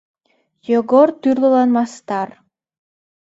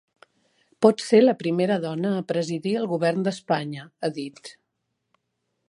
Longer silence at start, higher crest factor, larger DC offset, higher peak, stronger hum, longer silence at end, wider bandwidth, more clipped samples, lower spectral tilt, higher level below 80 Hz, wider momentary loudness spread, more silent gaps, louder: about the same, 0.7 s vs 0.8 s; about the same, 18 dB vs 22 dB; neither; about the same, 0 dBFS vs -2 dBFS; neither; second, 0.95 s vs 1.2 s; second, 8 kHz vs 11 kHz; neither; about the same, -6.5 dB/octave vs -6 dB/octave; first, -66 dBFS vs -74 dBFS; second, 11 LU vs 17 LU; neither; first, -16 LUFS vs -23 LUFS